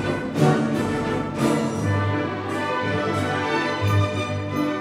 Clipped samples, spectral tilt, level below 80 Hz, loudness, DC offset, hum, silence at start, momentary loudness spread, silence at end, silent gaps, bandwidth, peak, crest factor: under 0.1%; -6.5 dB/octave; -50 dBFS; -23 LUFS; under 0.1%; none; 0 s; 5 LU; 0 s; none; 14 kHz; -6 dBFS; 16 dB